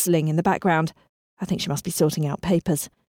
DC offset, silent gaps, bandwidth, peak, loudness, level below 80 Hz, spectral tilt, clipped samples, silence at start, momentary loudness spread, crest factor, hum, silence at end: under 0.1%; 1.09-1.37 s; 18 kHz; -8 dBFS; -23 LUFS; -52 dBFS; -5.5 dB/octave; under 0.1%; 0 s; 8 LU; 14 dB; none; 0.25 s